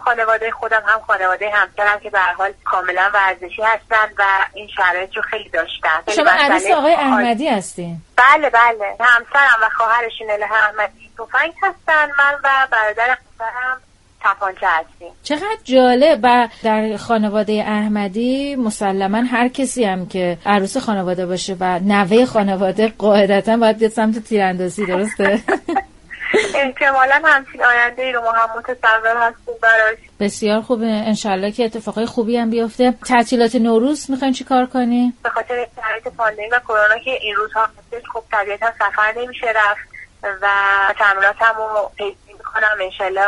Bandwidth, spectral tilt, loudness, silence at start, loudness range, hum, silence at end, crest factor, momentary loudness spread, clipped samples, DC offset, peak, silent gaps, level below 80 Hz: 11.5 kHz; -4.5 dB/octave; -16 LUFS; 0 s; 5 LU; none; 0 s; 16 dB; 9 LU; under 0.1%; under 0.1%; 0 dBFS; none; -50 dBFS